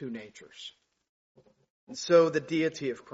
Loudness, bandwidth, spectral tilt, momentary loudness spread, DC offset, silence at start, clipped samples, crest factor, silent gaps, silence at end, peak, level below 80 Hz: -27 LUFS; 7.6 kHz; -4.5 dB/octave; 22 LU; under 0.1%; 0 s; under 0.1%; 20 dB; 1.09-1.35 s, 1.70-1.87 s; 0.1 s; -10 dBFS; -76 dBFS